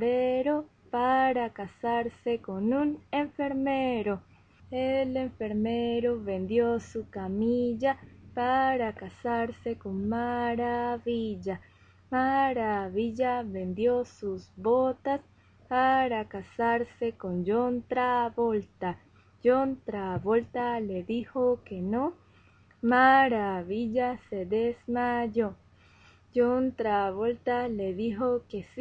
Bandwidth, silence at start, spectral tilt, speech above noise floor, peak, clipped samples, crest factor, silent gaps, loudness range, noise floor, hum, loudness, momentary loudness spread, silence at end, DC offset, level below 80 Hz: 7.6 kHz; 0 s; -7.5 dB/octave; 31 dB; -10 dBFS; under 0.1%; 18 dB; none; 4 LU; -59 dBFS; none; -29 LUFS; 9 LU; 0 s; under 0.1%; -62 dBFS